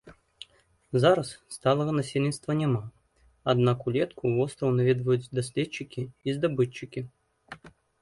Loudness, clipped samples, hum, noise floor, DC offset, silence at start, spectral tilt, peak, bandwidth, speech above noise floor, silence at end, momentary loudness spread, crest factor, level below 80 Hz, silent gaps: -27 LUFS; under 0.1%; none; -64 dBFS; under 0.1%; 0.05 s; -6.5 dB/octave; -8 dBFS; 11.5 kHz; 37 dB; 0.35 s; 23 LU; 18 dB; -62 dBFS; none